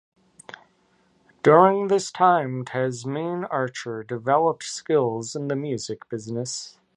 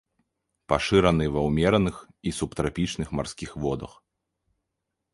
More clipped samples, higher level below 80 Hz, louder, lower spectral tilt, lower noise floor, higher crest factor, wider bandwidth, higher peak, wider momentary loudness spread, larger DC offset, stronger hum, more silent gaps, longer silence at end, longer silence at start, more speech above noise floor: neither; second, -70 dBFS vs -42 dBFS; first, -23 LUFS vs -26 LUFS; about the same, -5 dB/octave vs -6 dB/octave; second, -63 dBFS vs -82 dBFS; about the same, 22 dB vs 22 dB; about the same, 11.5 kHz vs 11.5 kHz; about the same, -2 dBFS vs -4 dBFS; about the same, 15 LU vs 13 LU; neither; neither; neither; second, 0.3 s vs 1.25 s; first, 1.45 s vs 0.7 s; second, 41 dB vs 57 dB